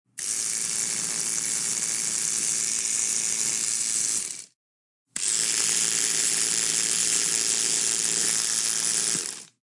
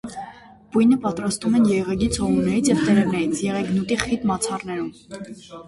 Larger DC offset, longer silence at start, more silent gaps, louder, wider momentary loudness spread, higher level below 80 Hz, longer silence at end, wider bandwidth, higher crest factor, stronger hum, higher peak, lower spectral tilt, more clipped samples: neither; about the same, 0.15 s vs 0.05 s; first, 4.55-5.06 s vs none; about the same, -23 LUFS vs -21 LUFS; second, 5 LU vs 18 LU; second, -68 dBFS vs -46 dBFS; first, 0.25 s vs 0 s; about the same, 12 kHz vs 11.5 kHz; about the same, 20 dB vs 20 dB; neither; second, -6 dBFS vs 0 dBFS; second, 1 dB/octave vs -5.5 dB/octave; neither